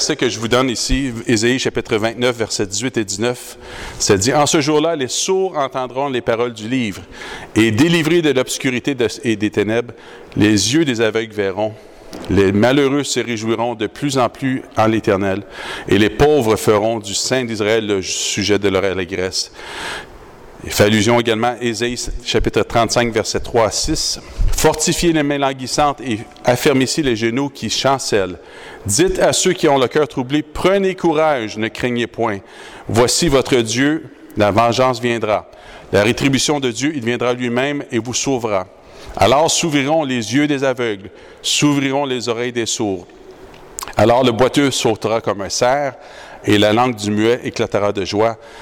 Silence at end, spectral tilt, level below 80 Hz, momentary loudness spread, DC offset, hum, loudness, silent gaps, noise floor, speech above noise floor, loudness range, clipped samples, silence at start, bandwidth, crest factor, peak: 0 s; -4 dB/octave; -36 dBFS; 10 LU; under 0.1%; none; -16 LUFS; none; -38 dBFS; 22 dB; 2 LU; under 0.1%; 0 s; 18 kHz; 12 dB; -4 dBFS